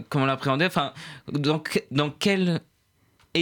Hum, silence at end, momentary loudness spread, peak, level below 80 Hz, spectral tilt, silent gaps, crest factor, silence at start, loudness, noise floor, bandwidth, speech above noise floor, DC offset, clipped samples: none; 0 s; 9 LU; -10 dBFS; -64 dBFS; -5.5 dB/octave; none; 16 dB; 0 s; -25 LUFS; -66 dBFS; 19 kHz; 41 dB; under 0.1%; under 0.1%